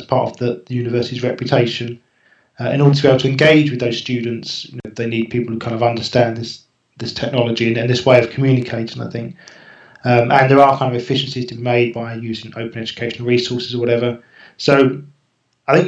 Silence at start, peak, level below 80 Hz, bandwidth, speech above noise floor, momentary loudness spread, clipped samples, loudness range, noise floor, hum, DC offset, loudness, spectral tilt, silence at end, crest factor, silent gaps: 0 s; 0 dBFS; -56 dBFS; 8.2 kHz; 48 dB; 15 LU; under 0.1%; 4 LU; -64 dBFS; none; under 0.1%; -17 LUFS; -6.5 dB/octave; 0 s; 16 dB; none